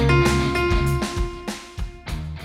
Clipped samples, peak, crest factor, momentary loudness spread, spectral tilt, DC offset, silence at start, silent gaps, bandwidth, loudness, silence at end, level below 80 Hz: under 0.1%; -8 dBFS; 14 dB; 15 LU; -5.5 dB/octave; under 0.1%; 0 s; none; 15.5 kHz; -23 LUFS; 0 s; -28 dBFS